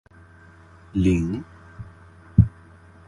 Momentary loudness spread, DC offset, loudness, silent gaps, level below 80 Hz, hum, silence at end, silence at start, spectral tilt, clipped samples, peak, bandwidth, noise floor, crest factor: 23 LU; under 0.1%; -23 LUFS; none; -36 dBFS; none; 0.6 s; 0.95 s; -8.5 dB/octave; under 0.1%; -2 dBFS; 10.5 kHz; -49 dBFS; 24 dB